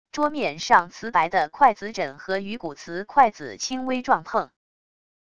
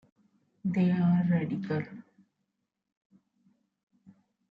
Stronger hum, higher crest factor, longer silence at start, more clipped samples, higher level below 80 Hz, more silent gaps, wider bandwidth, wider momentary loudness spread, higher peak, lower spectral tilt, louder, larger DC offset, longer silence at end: neither; first, 22 dB vs 16 dB; second, 0.15 s vs 0.65 s; neither; first, -60 dBFS vs -74 dBFS; neither; first, 10 kHz vs 5 kHz; about the same, 12 LU vs 14 LU; first, -2 dBFS vs -16 dBFS; second, -3.5 dB/octave vs -10 dB/octave; first, -23 LUFS vs -29 LUFS; first, 0.4% vs under 0.1%; second, 0.8 s vs 2.5 s